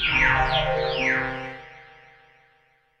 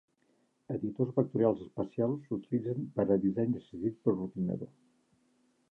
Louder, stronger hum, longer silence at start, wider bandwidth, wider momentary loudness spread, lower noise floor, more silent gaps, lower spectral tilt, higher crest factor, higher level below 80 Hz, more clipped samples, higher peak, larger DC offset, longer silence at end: first, -22 LUFS vs -33 LUFS; neither; second, 0 s vs 0.7 s; first, 10.5 kHz vs 4 kHz; first, 17 LU vs 9 LU; second, -63 dBFS vs -73 dBFS; neither; second, -4.5 dB/octave vs -11.5 dB/octave; about the same, 18 dB vs 20 dB; first, -38 dBFS vs -66 dBFS; neither; first, -8 dBFS vs -14 dBFS; neither; about the same, 1.15 s vs 1.05 s